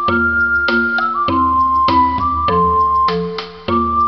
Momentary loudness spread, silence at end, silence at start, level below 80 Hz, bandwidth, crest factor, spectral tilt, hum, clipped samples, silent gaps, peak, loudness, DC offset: 5 LU; 0 s; 0 s; -34 dBFS; 6.2 kHz; 12 dB; -7.5 dB/octave; none; under 0.1%; none; -2 dBFS; -14 LUFS; 0.4%